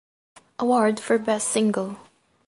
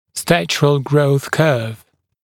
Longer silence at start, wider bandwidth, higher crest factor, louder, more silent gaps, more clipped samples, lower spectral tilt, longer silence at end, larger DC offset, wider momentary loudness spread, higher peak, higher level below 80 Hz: first, 0.6 s vs 0.15 s; second, 11.5 kHz vs 17 kHz; about the same, 18 dB vs 16 dB; second, -23 LUFS vs -16 LUFS; neither; neither; second, -4 dB/octave vs -5.5 dB/octave; about the same, 0.5 s vs 0.5 s; neither; first, 16 LU vs 4 LU; second, -8 dBFS vs 0 dBFS; second, -72 dBFS vs -52 dBFS